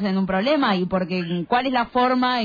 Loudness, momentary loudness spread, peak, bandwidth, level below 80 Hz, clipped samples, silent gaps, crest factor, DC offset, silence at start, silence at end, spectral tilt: -21 LUFS; 5 LU; -8 dBFS; 5 kHz; -52 dBFS; under 0.1%; none; 12 dB; under 0.1%; 0 s; 0 s; -7.5 dB/octave